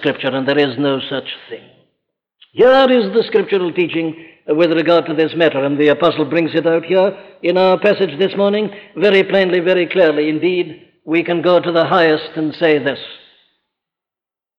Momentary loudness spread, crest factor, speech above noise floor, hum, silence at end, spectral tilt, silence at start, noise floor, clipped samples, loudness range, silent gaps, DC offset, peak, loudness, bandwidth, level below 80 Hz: 11 LU; 12 dB; 74 dB; none; 1.45 s; -7.5 dB/octave; 0 s; -89 dBFS; under 0.1%; 2 LU; none; under 0.1%; -2 dBFS; -15 LUFS; 6.4 kHz; -60 dBFS